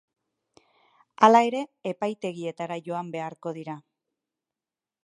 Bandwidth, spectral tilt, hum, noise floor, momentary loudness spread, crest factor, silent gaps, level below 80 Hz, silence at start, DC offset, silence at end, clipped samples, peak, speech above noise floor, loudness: 11 kHz; -5.5 dB/octave; none; under -90 dBFS; 18 LU; 26 dB; none; -80 dBFS; 1.2 s; under 0.1%; 1.25 s; under 0.1%; -2 dBFS; over 65 dB; -25 LUFS